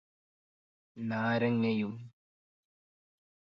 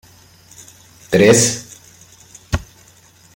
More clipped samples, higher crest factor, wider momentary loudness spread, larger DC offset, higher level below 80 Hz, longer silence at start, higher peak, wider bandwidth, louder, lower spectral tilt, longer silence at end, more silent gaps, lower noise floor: neither; about the same, 18 dB vs 20 dB; second, 12 LU vs 17 LU; neither; second, -76 dBFS vs -40 dBFS; second, 0.95 s vs 1.1 s; second, -18 dBFS vs 0 dBFS; second, 6 kHz vs 16.5 kHz; second, -32 LUFS vs -15 LUFS; first, -8.5 dB/octave vs -4 dB/octave; first, 1.5 s vs 0.75 s; neither; first, under -90 dBFS vs -48 dBFS